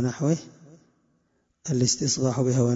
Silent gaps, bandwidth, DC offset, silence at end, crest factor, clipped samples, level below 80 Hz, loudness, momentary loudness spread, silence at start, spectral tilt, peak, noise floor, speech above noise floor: none; 8 kHz; under 0.1%; 0 s; 18 dB; under 0.1%; -60 dBFS; -24 LUFS; 7 LU; 0 s; -5 dB/octave; -8 dBFS; -70 dBFS; 46 dB